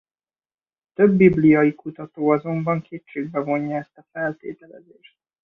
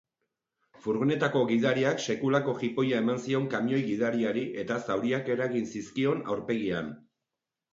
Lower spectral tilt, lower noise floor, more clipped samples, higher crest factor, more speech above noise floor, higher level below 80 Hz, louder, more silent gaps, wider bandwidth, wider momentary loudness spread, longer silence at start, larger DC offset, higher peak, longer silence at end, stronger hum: first, -10.5 dB/octave vs -6 dB/octave; about the same, under -90 dBFS vs -88 dBFS; neither; about the same, 20 dB vs 18 dB; first, over 70 dB vs 60 dB; first, -56 dBFS vs -68 dBFS; first, -20 LUFS vs -29 LUFS; neither; second, 3.9 kHz vs 7.8 kHz; first, 20 LU vs 7 LU; first, 1 s vs 0.85 s; neither; first, -2 dBFS vs -10 dBFS; about the same, 0.65 s vs 0.75 s; neither